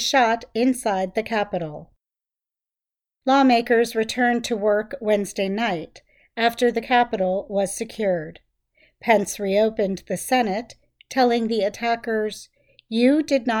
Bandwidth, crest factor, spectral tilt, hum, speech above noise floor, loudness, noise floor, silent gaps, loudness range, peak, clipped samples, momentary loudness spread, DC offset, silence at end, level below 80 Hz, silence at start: 19 kHz; 18 dB; -4 dB/octave; none; over 69 dB; -22 LUFS; under -90 dBFS; none; 3 LU; -4 dBFS; under 0.1%; 11 LU; under 0.1%; 0 s; -58 dBFS; 0 s